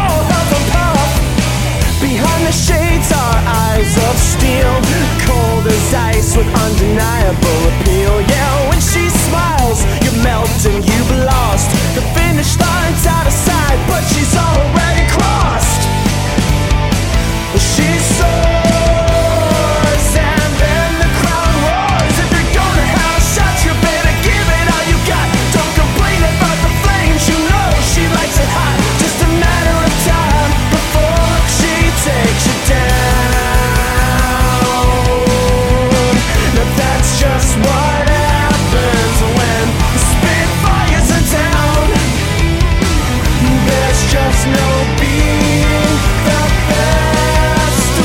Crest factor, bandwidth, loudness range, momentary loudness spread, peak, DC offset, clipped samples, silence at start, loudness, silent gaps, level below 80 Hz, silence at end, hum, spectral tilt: 10 dB; 17 kHz; 1 LU; 1 LU; 0 dBFS; under 0.1%; under 0.1%; 0 s; -12 LUFS; none; -16 dBFS; 0 s; none; -4.5 dB/octave